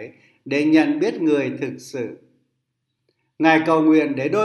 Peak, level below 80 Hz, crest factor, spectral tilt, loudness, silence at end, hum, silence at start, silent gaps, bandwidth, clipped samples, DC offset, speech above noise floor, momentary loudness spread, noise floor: 0 dBFS; -72 dBFS; 20 dB; -6 dB/octave; -19 LUFS; 0 s; none; 0 s; none; 10.5 kHz; under 0.1%; under 0.1%; 57 dB; 14 LU; -76 dBFS